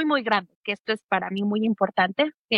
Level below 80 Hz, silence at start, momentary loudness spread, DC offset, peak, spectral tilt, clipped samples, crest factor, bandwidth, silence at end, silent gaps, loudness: -72 dBFS; 0 s; 6 LU; under 0.1%; -6 dBFS; -6.5 dB/octave; under 0.1%; 18 dB; 10.5 kHz; 0 s; 0.55-0.63 s, 0.80-0.85 s, 1.04-1.09 s, 2.34-2.49 s; -25 LUFS